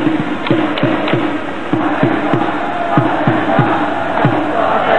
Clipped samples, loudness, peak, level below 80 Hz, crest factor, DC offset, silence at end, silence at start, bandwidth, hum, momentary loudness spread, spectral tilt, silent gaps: under 0.1%; -15 LUFS; 0 dBFS; -54 dBFS; 14 dB; 5%; 0 s; 0 s; 9.4 kHz; none; 4 LU; -7.5 dB/octave; none